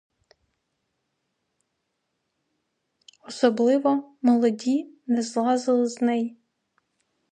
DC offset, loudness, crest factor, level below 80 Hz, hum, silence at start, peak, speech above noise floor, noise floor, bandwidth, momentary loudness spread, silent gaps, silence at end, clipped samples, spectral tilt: under 0.1%; -23 LUFS; 18 dB; -80 dBFS; none; 3.3 s; -8 dBFS; 56 dB; -78 dBFS; 9.6 kHz; 7 LU; none; 1 s; under 0.1%; -5 dB/octave